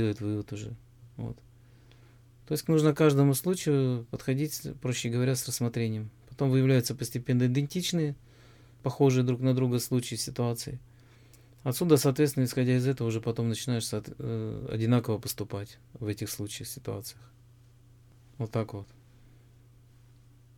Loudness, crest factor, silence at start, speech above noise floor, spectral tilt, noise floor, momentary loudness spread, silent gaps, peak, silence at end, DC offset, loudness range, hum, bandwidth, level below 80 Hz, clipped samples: -29 LUFS; 20 dB; 0 s; 28 dB; -6 dB/octave; -57 dBFS; 15 LU; none; -10 dBFS; 1.75 s; under 0.1%; 11 LU; none; 18.5 kHz; -60 dBFS; under 0.1%